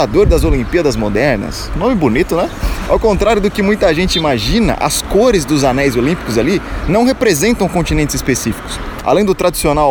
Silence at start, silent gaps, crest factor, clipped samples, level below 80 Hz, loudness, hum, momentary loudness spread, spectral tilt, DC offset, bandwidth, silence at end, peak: 0 s; none; 12 dB; under 0.1%; -24 dBFS; -13 LUFS; none; 6 LU; -5 dB/octave; under 0.1%; over 20 kHz; 0 s; 0 dBFS